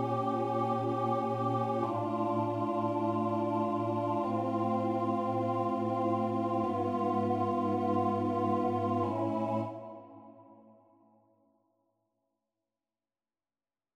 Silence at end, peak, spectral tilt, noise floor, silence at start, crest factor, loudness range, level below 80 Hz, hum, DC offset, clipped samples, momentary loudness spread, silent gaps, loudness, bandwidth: 3.4 s; -18 dBFS; -9 dB/octave; under -90 dBFS; 0 s; 14 dB; 5 LU; -74 dBFS; none; under 0.1%; under 0.1%; 2 LU; none; -32 LUFS; 10 kHz